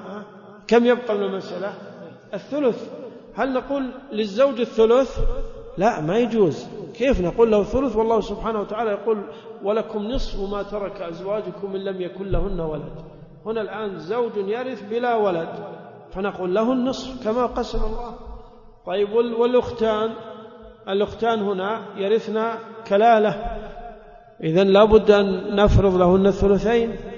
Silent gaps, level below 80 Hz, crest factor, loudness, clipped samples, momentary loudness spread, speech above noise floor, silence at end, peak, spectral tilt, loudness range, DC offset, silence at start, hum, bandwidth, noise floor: none; -34 dBFS; 20 dB; -21 LUFS; under 0.1%; 19 LU; 23 dB; 0 s; -2 dBFS; -7 dB/octave; 9 LU; under 0.1%; 0 s; none; 7.2 kHz; -44 dBFS